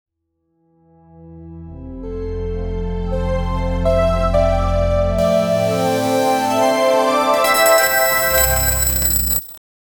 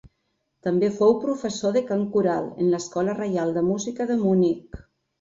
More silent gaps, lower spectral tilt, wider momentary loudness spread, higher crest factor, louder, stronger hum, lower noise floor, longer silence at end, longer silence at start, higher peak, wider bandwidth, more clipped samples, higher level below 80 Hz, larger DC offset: neither; second, -3.5 dB/octave vs -6.5 dB/octave; first, 14 LU vs 6 LU; about the same, 16 dB vs 16 dB; first, -16 LUFS vs -23 LUFS; neither; second, -69 dBFS vs -74 dBFS; about the same, 0.4 s vs 0.45 s; first, 1.15 s vs 0.65 s; first, -2 dBFS vs -6 dBFS; first, over 20 kHz vs 7.8 kHz; neither; first, -26 dBFS vs -56 dBFS; neither